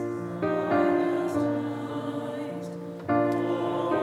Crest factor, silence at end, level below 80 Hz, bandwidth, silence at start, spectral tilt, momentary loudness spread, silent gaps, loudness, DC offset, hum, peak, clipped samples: 14 dB; 0 s; -70 dBFS; 12.5 kHz; 0 s; -7.5 dB/octave; 10 LU; none; -28 LUFS; under 0.1%; none; -12 dBFS; under 0.1%